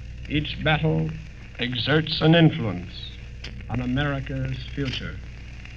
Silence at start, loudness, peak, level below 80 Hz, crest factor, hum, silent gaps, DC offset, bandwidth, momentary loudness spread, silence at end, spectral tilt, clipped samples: 0 s; -24 LUFS; -4 dBFS; -38 dBFS; 20 dB; none; none; 0.3%; 6.8 kHz; 20 LU; 0 s; -7.5 dB/octave; under 0.1%